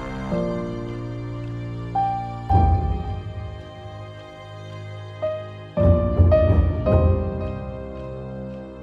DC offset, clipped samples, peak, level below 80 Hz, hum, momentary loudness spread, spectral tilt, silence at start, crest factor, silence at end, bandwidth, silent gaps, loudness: under 0.1%; under 0.1%; -4 dBFS; -30 dBFS; none; 19 LU; -9.5 dB/octave; 0 s; 18 dB; 0 s; 5 kHz; none; -23 LUFS